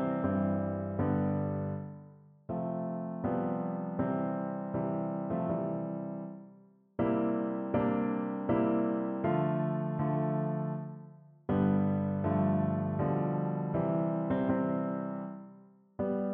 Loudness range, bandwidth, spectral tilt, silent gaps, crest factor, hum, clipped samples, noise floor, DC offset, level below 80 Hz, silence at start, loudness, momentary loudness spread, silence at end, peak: 4 LU; 3.7 kHz; -9.5 dB/octave; none; 16 dB; none; under 0.1%; -59 dBFS; under 0.1%; -62 dBFS; 0 s; -33 LUFS; 11 LU; 0 s; -16 dBFS